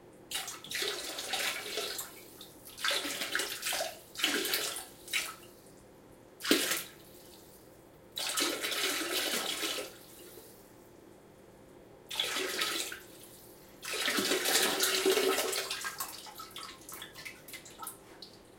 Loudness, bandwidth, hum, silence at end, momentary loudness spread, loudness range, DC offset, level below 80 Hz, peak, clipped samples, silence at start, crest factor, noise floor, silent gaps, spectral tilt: -32 LUFS; 17 kHz; none; 0 s; 23 LU; 7 LU; under 0.1%; -70 dBFS; -6 dBFS; under 0.1%; 0 s; 30 dB; -56 dBFS; none; -0.5 dB/octave